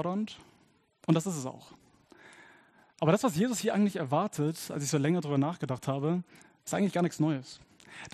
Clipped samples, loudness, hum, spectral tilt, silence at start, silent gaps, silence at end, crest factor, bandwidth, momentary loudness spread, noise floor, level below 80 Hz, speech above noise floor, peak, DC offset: under 0.1%; -31 LUFS; none; -6 dB/octave; 0 s; none; 0.05 s; 22 dB; 13 kHz; 19 LU; -67 dBFS; -74 dBFS; 37 dB; -10 dBFS; under 0.1%